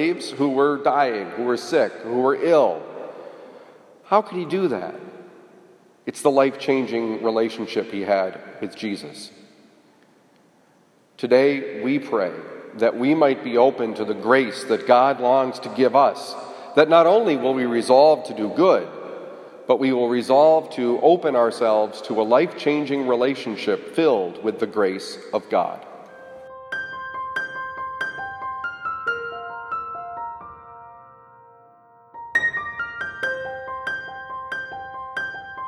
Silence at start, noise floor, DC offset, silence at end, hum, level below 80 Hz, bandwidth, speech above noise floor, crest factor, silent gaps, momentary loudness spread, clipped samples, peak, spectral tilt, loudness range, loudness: 0 s; -58 dBFS; under 0.1%; 0 s; none; -68 dBFS; 12.5 kHz; 38 dB; 20 dB; none; 17 LU; under 0.1%; -2 dBFS; -5.5 dB/octave; 11 LU; -21 LUFS